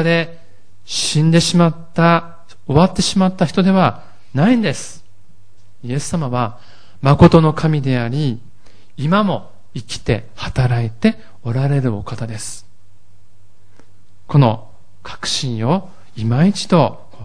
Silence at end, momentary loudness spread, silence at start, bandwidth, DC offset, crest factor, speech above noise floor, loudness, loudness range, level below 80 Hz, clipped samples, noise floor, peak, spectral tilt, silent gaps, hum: 0 s; 15 LU; 0 s; 10.5 kHz; 3%; 18 dB; 38 dB; -16 LUFS; 6 LU; -40 dBFS; 0.1%; -54 dBFS; 0 dBFS; -6 dB/octave; none; none